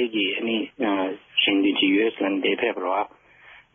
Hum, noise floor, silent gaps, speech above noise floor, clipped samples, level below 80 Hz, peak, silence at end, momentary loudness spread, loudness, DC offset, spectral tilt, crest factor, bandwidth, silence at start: none; -51 dBFS; none; 27 dB; under 0.1%; -70 dBFS; -10 dBFS; 0.2 s; 7 LU; -23 LUFS; under 0.1%; -1 dB/octave; 14 dB; 3.7 kHz; 0 s